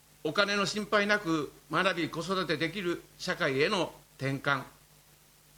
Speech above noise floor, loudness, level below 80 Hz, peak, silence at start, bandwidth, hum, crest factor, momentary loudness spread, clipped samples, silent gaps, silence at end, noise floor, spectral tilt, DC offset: 30 dB; -30 LUFS; -64 dBFS; -10 dBFS; 0.25 s; 19.5 kHz; none; 22 dB; 8 LU; under 0.1%; none; 0.85 s; -60 dBFS; -4.5 dB/octave; under 0.1%